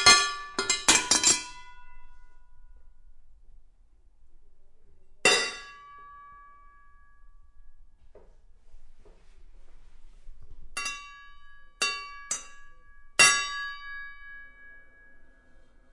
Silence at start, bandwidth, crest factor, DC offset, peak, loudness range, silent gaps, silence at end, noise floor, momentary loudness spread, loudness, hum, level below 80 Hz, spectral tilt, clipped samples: 0 s; 11.5 kHz; 26 dB; under 0.1%; -6 dBFS; 16 LU; none; 0.75 s; -56 dBFS; 28 LU; -24 LUFS; none; -52 dBFS; 0.5 dB/octave; under 0.1%